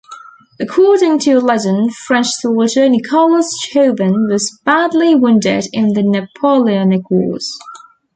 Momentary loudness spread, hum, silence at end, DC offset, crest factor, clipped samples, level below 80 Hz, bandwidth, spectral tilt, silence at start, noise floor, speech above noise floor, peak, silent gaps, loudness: 5 LU; none; 0.4 s; under 0.1%; 12 dB; under 0.1%; -58 dBFS; 9.4 kHz; -5 dB/octave; 0.1 s; -37 dBFS; 24 dB; -2 dBFS; none; -13 LUFS